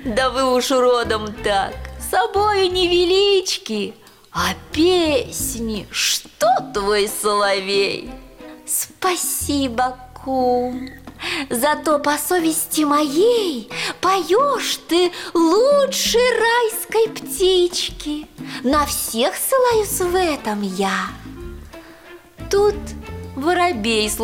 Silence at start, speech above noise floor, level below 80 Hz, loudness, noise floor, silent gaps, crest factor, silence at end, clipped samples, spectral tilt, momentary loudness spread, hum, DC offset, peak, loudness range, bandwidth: 0 s; 24 dB; -42 dBFS; -18 LUFS; -42 dBFS; none; 12 dB; 0 s; under 0.1%; -3 dB/octave; 13 LU; none; under 0.1%; -8 dBFS; 5 LU; 17.5 kHz